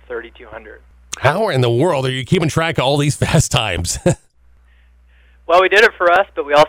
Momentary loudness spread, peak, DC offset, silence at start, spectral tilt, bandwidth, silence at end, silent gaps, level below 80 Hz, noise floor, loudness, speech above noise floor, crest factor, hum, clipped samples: 18 LU; -4 dBFS; under 0.1%; 0.1 s; -4.5 dB/octave; 16.5 kHz; 0 s; none; -38 dBFS; -50 dBFS; -15 LUFS; 34 dB; 14 dB; 60 Hz at -40 dBFS; under 0.1%